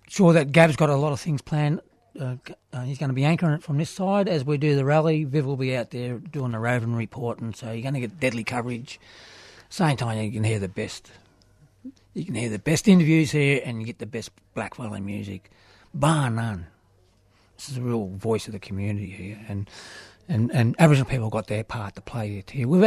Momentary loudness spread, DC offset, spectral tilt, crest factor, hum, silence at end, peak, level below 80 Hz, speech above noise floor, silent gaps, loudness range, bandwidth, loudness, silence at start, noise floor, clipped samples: 17 LU; under 0.1%; -6.5 dB/octave; 22 dB; none; 0 s; -2 dBFS; -54 dBFS; 37 dB; none; 6 LU; 13.5 kHz; -24 LUFS; 0.1 s; -60 dBFS; under 0.1%